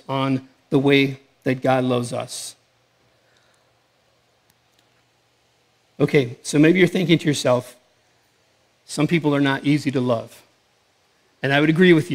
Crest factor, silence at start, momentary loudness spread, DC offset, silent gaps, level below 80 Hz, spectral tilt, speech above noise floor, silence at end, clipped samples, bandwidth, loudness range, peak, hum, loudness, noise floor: 20 dB; 0.1 s; 13 LU; under 0.1%; none; -66 dBFS; -6 dB/octave; 44 dB; 0 s; under 0.1%; 15.5 kHz; 8 LU; -2 dBFS; none; -20 LUFS; -63 dBFS